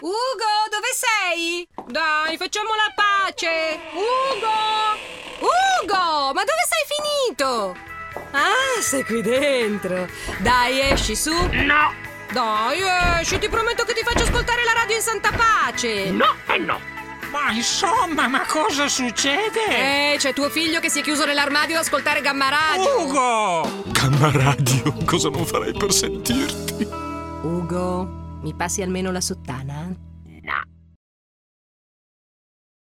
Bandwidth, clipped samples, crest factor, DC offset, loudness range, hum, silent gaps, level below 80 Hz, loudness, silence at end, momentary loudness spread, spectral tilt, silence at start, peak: 16.5 kHz; under 0.1%; 22 dB; under 0.1%; 7 LU; none; none; -38 dBFS; -20 LUFS; 2.3 s; 10 LU; -3 dB/octave; 0 s; 0 dBFS